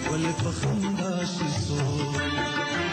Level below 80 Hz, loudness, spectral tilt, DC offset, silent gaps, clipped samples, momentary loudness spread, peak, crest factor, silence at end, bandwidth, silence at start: -48 dBFS; -27 LUFS; -5 dB/octave; under 0.1%; none; under 0.1%; 1 LU; -16 dBFS; 10 dB; 0 s; 9.6 kHz; 0 s